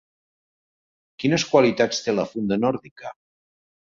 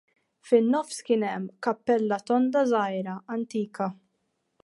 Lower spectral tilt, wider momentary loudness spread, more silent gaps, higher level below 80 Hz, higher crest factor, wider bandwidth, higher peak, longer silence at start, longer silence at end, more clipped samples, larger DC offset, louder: about the same, -5 dB/octave vs -6 dB/octave; first, 20 LU vs 10 LU; first, 2.91-2.96 s vs none; first, -62 dBFS vs -78 dBFS; about the same, 22 dB vs 18 dB; second, 7.8 kHz vs 11.5 kHz; first, -4 dBFS vs -8 dBFS; first, 1.2 s vs 0.45 s; first, 0.85 s vs 0.7 s; neither; neither; first, -22 LUFS vs -26 LUFS